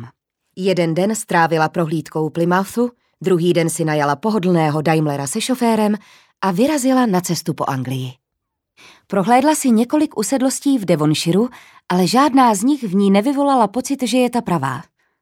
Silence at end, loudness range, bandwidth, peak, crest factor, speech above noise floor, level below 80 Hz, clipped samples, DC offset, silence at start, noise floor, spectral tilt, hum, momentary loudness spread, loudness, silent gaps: 0.4 s; 3 LU; 17 kHz; 0 dBFS; 16 dB; 61 dB; -62 dBFS; under 0.1%; under 0.1%; 0 s; -78 dBFS; -5.5 dB/octave; none; 8 LU; -17 LUFS; none